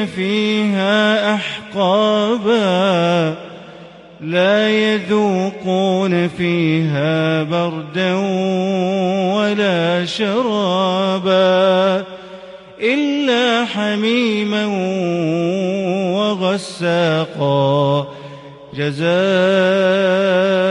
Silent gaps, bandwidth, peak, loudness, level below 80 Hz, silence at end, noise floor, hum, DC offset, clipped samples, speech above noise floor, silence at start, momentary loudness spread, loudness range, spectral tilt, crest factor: none; 11 kHz; -4 dBFS; -16 LUFS; -60 dBFS; 0 s; -38 dBFS; none; under 0.1%; under 0.1%; 23 dB; 0 s; 7 LU; 2 LU; -6 dB/octave; 12 dB